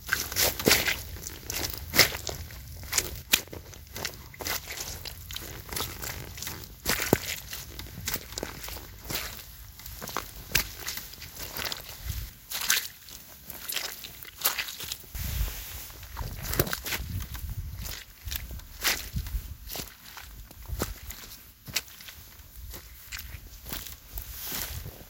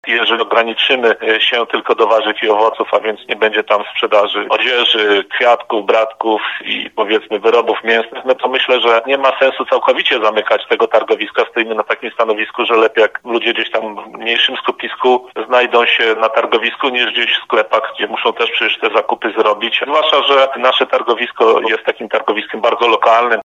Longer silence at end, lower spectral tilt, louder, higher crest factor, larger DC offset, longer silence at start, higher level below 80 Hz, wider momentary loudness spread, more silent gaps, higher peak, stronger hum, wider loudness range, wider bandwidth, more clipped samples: about the same, 0 s vs 0 s; about the same, -2 dB/octave vs -3 dB/octave; second, -31 LUFS vs -13 LUFS; first, 32 dB vs 14 dB; neither; about the same, 0 s vs 0.05 s; first, -44 dBFS vs -70 dBFS; first, 18 LU vs 6 LU; neither; about the same, -2 dBFS vs 0 dBFS; neither; first, 10 LU vs 2 LU; first, 17 kHz vs 7.6 kHz; neither